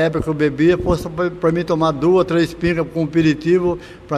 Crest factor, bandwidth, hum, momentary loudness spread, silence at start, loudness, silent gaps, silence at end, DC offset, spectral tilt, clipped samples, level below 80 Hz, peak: 14 dB; 13.5 kHz; none; 5 LU; 0 s; -17 LUFS; none; 0 s; under 0.1%; -7.5 dB/octave; under 0.1%; -38 dBFS; -4 dBFS